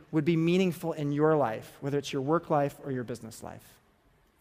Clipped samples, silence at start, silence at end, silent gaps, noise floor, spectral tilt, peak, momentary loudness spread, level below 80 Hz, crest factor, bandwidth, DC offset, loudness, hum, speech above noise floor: under 0.1%; 0.1 s; 0.8 s; none; -65 dBFS; -7 dB/octave; -12 dBFS; 14 LU; -66 dBFS; 18 dB; 15.5 kHz; under 0.1%; -29 LUFS; none; 37 dB